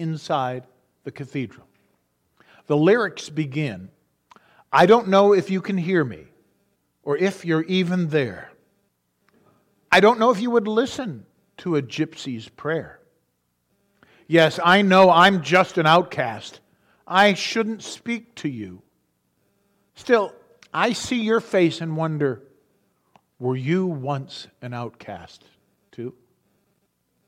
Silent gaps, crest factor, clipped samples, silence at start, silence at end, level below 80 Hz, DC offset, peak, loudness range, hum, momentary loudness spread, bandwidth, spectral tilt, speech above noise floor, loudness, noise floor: none; 20 dB; under 0.1%; 0 s; 1.15 s; -66 dBFS; under 0.1%; -4 dBFS; 12 LU; 60 Hz at -50 dBFS; 21 LU; 15 kHz; -5.5 dB/octave; 51 dB; -20 LUFS; -72 dBFS